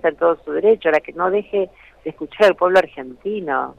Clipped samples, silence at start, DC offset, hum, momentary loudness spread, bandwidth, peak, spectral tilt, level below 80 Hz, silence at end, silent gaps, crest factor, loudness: under 0.1%; 0.05 s; under 0.1%; none; 15 LU; 11 kHz; -4 dBFS; -5.5 dB/octave; -56 dBFS; 0.05 s; none; 14 dB; -18 LUFS